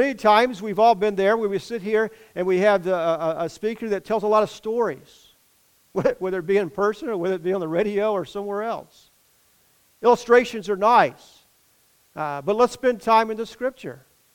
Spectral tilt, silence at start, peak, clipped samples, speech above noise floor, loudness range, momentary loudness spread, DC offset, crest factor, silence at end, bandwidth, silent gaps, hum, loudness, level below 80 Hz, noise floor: -5.5 dB/octave; 0 s; -4 dBFS; under 0.1%; 39 dB; 4 LU; 11 LU; under 0.1%; 20 dB; 0.4 s; 17 kHz; none; none; -22 LUFS; -60 dBFS; -61 dBFS